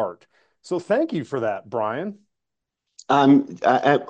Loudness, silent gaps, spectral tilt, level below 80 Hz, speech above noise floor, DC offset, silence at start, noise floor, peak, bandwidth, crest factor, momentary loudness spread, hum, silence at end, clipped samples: -21 LUFS; none; -6.5 dB/octave; -72 dBFS; 62 dB; under 0.1%; 0 s; -83 dBFS; -4 dBFS; 8.6 kHz; 18 dB; 14 LU; none; 0 s; under 0.1%